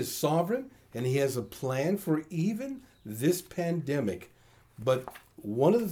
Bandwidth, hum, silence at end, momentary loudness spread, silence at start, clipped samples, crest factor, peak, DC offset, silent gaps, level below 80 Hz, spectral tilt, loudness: over 20 kHz; none; 0 s; 14 LU; 0 s; under 0.1%; 18 dB; -12 dBFS; under 0.1%; none; -66 dBFS; -6 dB/octave; -30 LUFS